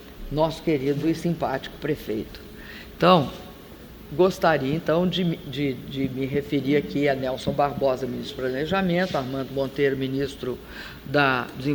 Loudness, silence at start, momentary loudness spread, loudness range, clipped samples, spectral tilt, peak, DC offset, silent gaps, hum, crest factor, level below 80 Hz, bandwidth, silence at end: -24 LUFS; 0 s; 16 LU; 2 LU; under 0.1%; -6.5 dB/octave; -2 dBFS; under 0.1%; none; none; 22 dB; -48 dBFS; over 20 kHz; 0 s